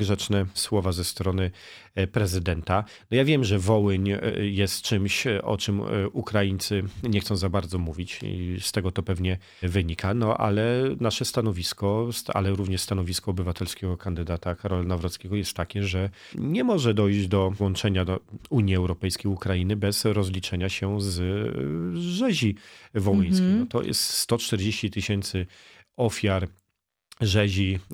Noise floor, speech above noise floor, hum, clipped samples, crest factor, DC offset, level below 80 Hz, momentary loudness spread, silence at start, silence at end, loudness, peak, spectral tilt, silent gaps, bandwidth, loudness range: -80 dBFS; 54 dB; none; under 0.1%; 20 dB; under 0.1%; -46 dBFS; 8 LU; 0 s; 0 s; -26 LUFS; -6 dBFS; -5.5 dB/octave; none; 16.5 kHz; 4 LU